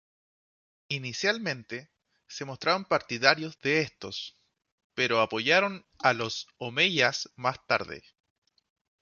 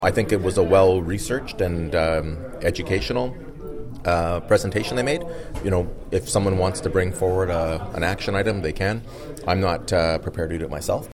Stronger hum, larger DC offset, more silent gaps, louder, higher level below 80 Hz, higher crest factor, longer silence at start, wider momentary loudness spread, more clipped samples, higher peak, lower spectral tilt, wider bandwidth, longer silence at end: neither; neither; first, 4.72-4.78 s, 4.84-4.90 s vs none; second, -27 LUFS vs -23 LUFS; second, -68 dBFS vs -36 dBFS; first, 26 dB vs 16 dB; first, 0.9 s vs 0 s; first, 16 LU vs 9 LU; neither; about the same, -4 dBFS vs -6 dBFS; second, -3.5 dB/octave vs -5.5 dB/octave; second, 7.4 kHz vs 16.5 kHz; first, 1 s vs 0 s